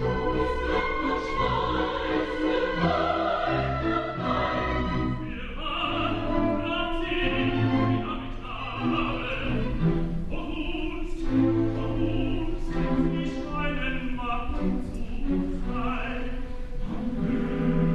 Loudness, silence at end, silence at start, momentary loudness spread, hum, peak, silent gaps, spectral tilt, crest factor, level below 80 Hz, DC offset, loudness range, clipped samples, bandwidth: -28 LUFS; 0 s; 0 s; 8 LU; none; -10 dBFS; none; -7.5 dB/octave; 16 dB; -34 dBFS; under 0.1%; 4 LU; under 0.1%; 7.6 kHz